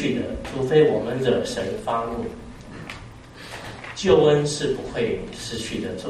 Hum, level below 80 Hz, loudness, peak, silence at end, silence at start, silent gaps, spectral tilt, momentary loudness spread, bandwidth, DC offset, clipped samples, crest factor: none; -46 dBFS; -23 LUFS; -4 dBFS; 0 s; 0 s; none; -5.5 dB/octave; 20 LU; 12.5 kHz; under 0.1%; under 0.1%; 20 dB